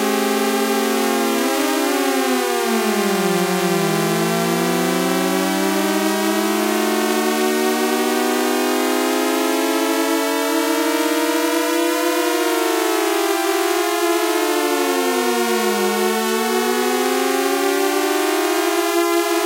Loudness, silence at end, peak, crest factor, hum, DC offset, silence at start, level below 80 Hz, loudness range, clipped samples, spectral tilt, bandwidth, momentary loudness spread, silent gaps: -18 LUFS; 0 s; -6 dBFS; 12 dB; none; under 0.1%; 0 s; -76 dBFS; 0 LU; under 0.1%; -3.5 dB/octave; 16 kHz; 0 LU; none